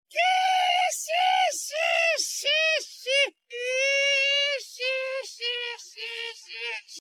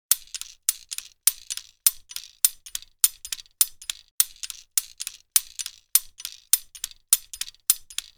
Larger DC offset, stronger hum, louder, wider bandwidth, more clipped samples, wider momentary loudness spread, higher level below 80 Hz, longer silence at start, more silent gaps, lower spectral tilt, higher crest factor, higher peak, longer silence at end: neither; neither; about the same, -24 LUFS vs -24 LUFS; second, 18 kHz vs over 20 kHz; neither; about the same, 12 LU vs 14 LU; second, under -90 dBFS vs -60 dBFS; about the same, 0.1 s vs 0.1 s; second, none vs 4.11-4.18 s; about the same, 5.5 dB/octave vs 6 dB/octave; second, 14 dB vs 28 dB; second, -12 dBFS vs 0 dBFS; second, 0 s vs 0.15 s